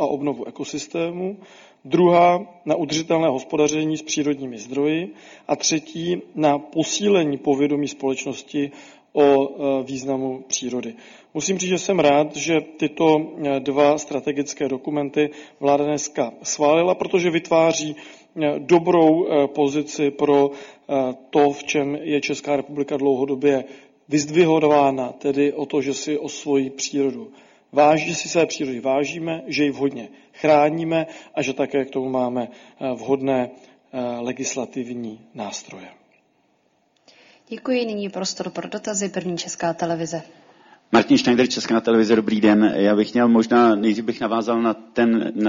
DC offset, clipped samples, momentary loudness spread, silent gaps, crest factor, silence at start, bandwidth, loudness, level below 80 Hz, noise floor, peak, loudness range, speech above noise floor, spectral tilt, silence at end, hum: under 0.1%; under 0.1%; 12 LU; none; 18 dB; 0 s; 7.6 kHz; -21 LUFS; -64 dBFS; -64 dBFS; -2 dBFS; 8 LU; 44 dB; -4.5 dB/octave; 0 s; none